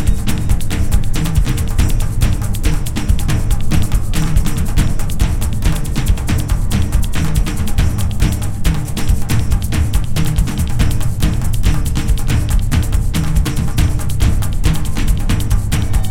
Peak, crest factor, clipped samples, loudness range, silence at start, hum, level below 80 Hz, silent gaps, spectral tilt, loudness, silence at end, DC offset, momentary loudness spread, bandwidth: 0 dBFS; 12 dB; under 0.1%; 1 LU; 0 s; none; -16 dBFS; none; -5.5 dB/octave; -18 LUFS; 0 s; under 0.1%; 2 LU; 16.5 kHz